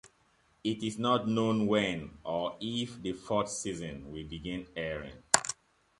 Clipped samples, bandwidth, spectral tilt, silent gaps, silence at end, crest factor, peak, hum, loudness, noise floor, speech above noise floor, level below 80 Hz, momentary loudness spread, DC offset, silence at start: under 0.1%; 11.5 kHz; -3.5 dB/octave; none; 0.45 s; 30 dB; -2 dBFS; none; -33 LUFS; -69 dBFS; 36 dB; -58 dBFS; 13 LU; under 0.1%; 0.05 s